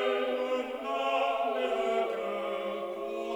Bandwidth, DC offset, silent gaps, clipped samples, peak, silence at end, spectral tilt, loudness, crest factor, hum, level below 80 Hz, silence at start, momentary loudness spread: 19.5 kHz; under 0.1%; none; under 0.1%; -18 dBFS; 0 s; -4 dB/octave; -31 LUFS; 14 dB; none; -70 dBFS; 0 s; 7 LU